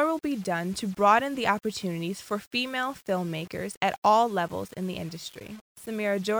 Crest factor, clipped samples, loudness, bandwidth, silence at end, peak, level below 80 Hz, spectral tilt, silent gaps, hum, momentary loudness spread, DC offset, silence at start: 20 dB; under 0.1%; -28 LUFS; over 20 kHz; 0 s; -8 dBFS; -64 dBFS; -5 dB/octave; 2.47-2.51 s, 3.77-3.81 s, 3.98-4.02 s, 5.61-5.75 s; none; 15 LU; under 0.1%; 0 s